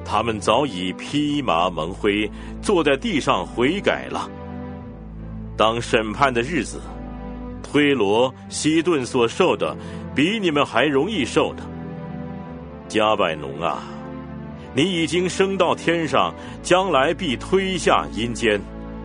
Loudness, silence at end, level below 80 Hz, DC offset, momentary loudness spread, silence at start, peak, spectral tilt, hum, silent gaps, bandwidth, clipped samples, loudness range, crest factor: -21 LUFS; 0 s; -42 dBFS; under 0.1%; 15 LU; 0 s; 0 dBFS; -4.5 dB/octave; none; none; 10 kHz; under 0.1%; 4 LU; 20 dB